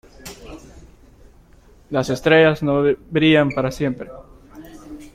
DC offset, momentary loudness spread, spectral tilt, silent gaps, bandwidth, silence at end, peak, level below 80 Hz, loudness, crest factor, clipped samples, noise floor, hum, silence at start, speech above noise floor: under 0.1%; 25 LU; -6 dB/octave; none; 15.5 kHz; 0.05 s; -2 dBFS; -46 dBFS; -18 LUFS; 20 dB; under 0.1%; -49 dBFS; none; 0.25 s; 32 dB